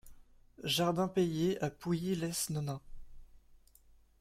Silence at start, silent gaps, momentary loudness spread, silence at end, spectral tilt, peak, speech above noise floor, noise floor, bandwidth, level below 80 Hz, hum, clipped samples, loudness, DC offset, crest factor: 0.05 s; none; 9 LU; 0.65 s; -5 dB/octave; -20 dBFS; 30 dB; -63 dBFS; 16 kHz; -58 dBFS; none; under 0.1%; -34 LUFS; under 0.1%; 18 dB